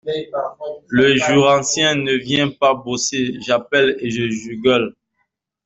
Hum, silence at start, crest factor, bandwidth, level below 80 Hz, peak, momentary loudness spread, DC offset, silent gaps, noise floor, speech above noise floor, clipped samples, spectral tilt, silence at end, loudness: none; 0.05 s; 16 dB; 8.2 kHz; -54 dBFS; -2 dBFS; 11 LU; under 0.1%; none; -71 dBFS; 54 dB; under 0.1%; -3.5 dB/octave; 0.75 s; -17 LUFS